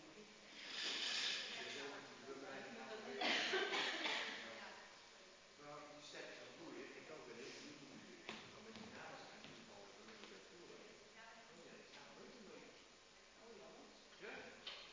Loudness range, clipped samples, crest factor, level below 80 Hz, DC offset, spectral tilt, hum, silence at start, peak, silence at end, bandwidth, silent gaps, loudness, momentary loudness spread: 16 LU; under 0.1%; 24 dB; -86 dBFS; under 0.1%; -1.5 dB/octave; none; 0 s; -28 dBFS; 0 s; 7.8 kHz; none; -47 LUFS; 20 LU